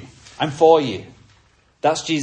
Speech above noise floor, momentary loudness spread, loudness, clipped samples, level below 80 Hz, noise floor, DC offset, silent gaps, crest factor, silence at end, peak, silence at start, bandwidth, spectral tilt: 39 dB; 12 LU; -18 LUFS; under 0.1%; -58 dBFS; -56 dBFS; under 0.1%; none; 18 dB; 0 s; -2 dBFS; 0 s; 9.4 kHz; -4.5 dB/octave